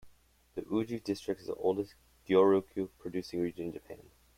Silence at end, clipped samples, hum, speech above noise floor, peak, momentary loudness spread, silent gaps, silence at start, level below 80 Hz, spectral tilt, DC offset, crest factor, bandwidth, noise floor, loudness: 0.35 s; under 0.1%; none; 30 dB; -12 dBFS; 18 LU; none; 0.05 s; -66 dBFS; -7 dB/octave; under 0.1%; 22 dB; 15.5 kHz; -63 dBFS; -33 LUFS